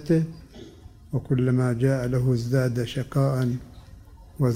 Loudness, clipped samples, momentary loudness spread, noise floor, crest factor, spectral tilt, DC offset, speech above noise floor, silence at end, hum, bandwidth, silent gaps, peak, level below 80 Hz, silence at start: -25 LUFS; under 0.1%; 11 LU; -46 dBFS; 16 dB; -8 dB/octave; under 0.1%; 23 dB; 0 s; none; 15 kHz; none; -10 dBFS; -48 dBFS; 0 s